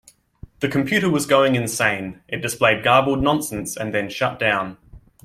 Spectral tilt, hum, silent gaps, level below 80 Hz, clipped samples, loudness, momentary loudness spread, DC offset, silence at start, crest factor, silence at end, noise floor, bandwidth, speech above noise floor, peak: -4.5 dB/octave; none; none; -46 dBFS; under 0.1%; -20 LUFS; 11 LU; under 0.1%; 0.6 s; 20 dB; 0.25 s; -44 dBFS; 16 kHz; 24 dB; -2 dBFS